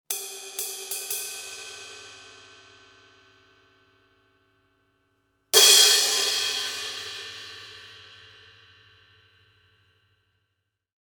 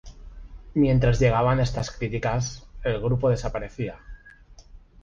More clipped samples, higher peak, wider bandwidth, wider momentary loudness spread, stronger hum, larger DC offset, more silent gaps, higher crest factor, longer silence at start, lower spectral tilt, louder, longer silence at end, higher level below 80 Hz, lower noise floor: neither; first, -2 dBFS vs -8 dBFS; first, 19 kHz vs 7.6 kHz; first, 28 LU vs 13 LU; neither; neither; neither; first, 26 dB vs 16 dB; about the same, 0.1 s vs 0.05 s; second, 2.5 dB/octave vs -6.5 dB/octave; first, -20 LUFS vs -25 LUFS; first, 3.05 s vs 0.25 s; second, -76 dBFS vs -36 dBFS; first, -79 dBFS vs -49 dBFS